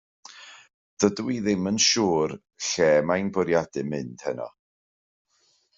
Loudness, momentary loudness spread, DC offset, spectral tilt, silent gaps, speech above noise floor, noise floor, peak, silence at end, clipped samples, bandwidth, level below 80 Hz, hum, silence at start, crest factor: -24 LUFS; 15 LU; under 0.1%; -3.5 dB/octave; 0.74-0.97 s; 43 dB; -67 dBFS; -6 dBFS; 1.3 s; under 0.1%; 8 kHz; -64 dBFS; none; 0.35 s; 20 dB